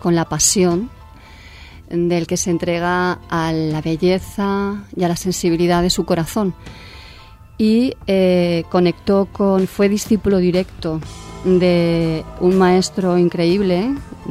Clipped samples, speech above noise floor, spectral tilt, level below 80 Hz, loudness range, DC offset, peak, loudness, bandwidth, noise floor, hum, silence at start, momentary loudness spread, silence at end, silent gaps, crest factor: under 0.1%; 24 dB; -5 dB/octave; -40 dBFS; 3 LU; under 0.1%; -2 dBFS; -17 LUFS; 15.5 kHz; -40 dBFS; none; 0 s; 10 LU; 0 s; none; 16 dB